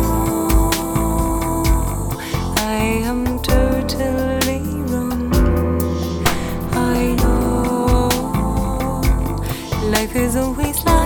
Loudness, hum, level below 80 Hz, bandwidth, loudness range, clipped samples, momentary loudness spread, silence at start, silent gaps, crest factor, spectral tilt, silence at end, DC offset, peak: -19 LUFS; none; -22 dBFS; over 20 kHz; 1 LU; under 0.1%; 5 LU; 0 s; none; 16 dB; -5.5 dB/octave; 0 s; under 0.1%; 0 dBFS